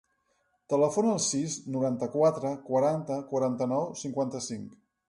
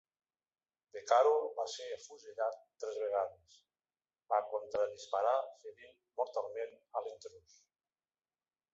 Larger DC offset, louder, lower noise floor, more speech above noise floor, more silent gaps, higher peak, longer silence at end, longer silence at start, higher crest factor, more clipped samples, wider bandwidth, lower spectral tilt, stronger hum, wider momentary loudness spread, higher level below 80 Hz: neither; first, -29 LUFS vs -36 LUFS; second, -74 dBFS vs under -90 dBFS; second, 45 dB vs over 53 dB; neither; first, -12 dBFS vs -16 dBFS; second, 0.35 s vs 1.35 s; second, 0.7 s vs 0.95 s; second, 16 dB vs 22 dB; neither; first, 11.5 kHz vs 8 kHz; first, -5 dB/octave vs 0 dB/octave; neither; second, 8 LU vs 18 LU; first, -72 dBFS vs -84 dBFS